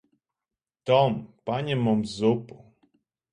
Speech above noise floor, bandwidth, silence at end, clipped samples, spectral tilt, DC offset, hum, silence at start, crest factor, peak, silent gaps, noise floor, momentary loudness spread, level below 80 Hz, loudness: 65 dB; 10.5 kHz; 0.85 s; under 0.1%; -7 dB/octave; under 0.1%; none; 0.85 s; 20 dB; -8 dBFS; none; -90 dBFS; 10 LU; -62 dBFS; -25 LUFS